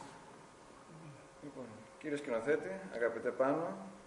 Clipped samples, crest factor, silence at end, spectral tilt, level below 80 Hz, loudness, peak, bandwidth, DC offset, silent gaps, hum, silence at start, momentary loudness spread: under 0.1%; 20 dB; 0 s; -6 dB/octave; -76 dBFS; -38 LUFS; -20 dBFS; 11 kHz; under 0.1%; none; none; 0 s; 22 LU